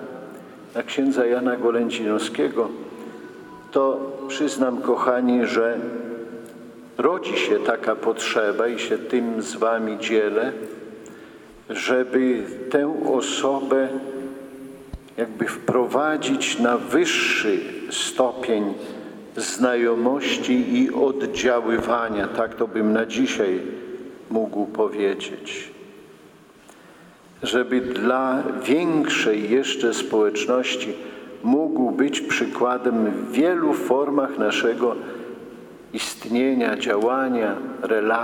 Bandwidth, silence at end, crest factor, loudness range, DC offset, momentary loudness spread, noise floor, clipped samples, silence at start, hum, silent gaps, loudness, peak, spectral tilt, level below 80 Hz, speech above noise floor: 17.5 kHz; 0 s; 18 dB; 3 LU; under 0.1%; 16 LU; -49 dBFS; under 0.1%; 0 s; none; none; -22 LUFS; -4 dBFS; -3.5 dB/octave; -58 dBFS; 27 dB